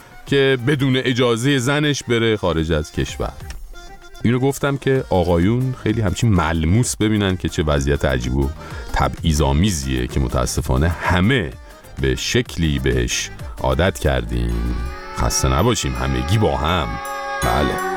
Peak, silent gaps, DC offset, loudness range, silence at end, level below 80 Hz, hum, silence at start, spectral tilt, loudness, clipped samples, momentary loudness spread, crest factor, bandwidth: -2 dBFS; none; under 0.1%; 2 LU; 0 s; -28 dBFS; none; 0.1 s; -5 dB/octave; -19 LUFS; under 0.1%; 8 LU; 16 dB; 18 kHz